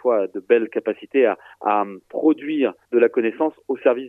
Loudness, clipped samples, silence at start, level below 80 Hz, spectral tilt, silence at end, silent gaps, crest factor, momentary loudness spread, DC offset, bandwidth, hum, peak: -21 LUFS; under 0.1%; 0.05 s; -76 dBFS; -7.5 dB/octave; 0 s; none; 18 dB; 6 LU; under 0.1%; 3.8 kHz; none; -2 dBFS